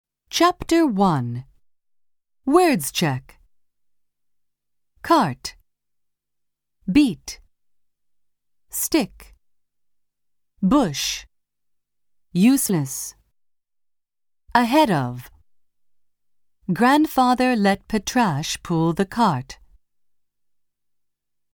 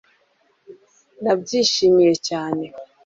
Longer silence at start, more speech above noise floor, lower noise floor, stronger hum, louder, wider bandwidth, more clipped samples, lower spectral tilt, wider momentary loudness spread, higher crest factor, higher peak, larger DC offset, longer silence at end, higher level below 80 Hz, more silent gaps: second, 0.3 s vs 0.7 s; first, 57 dB vs 45 dB; first, -77 dBFS vs -63 dBFS; neither; about the same, -20 LUFS vs -19 LUFS; first, over 20 kHz vs 7.8 kHz; neither; about the same, -5 dB/octave vs -4 dB/octave; first, 16 LU vs 13 LU; about the same, 20 dB vs 16 dB; first, -2 dBFS vs -6 dBFS; neither; first, 2.05 s vs 0.2 s; first, -50 dBFS vs -64 dBFS; neither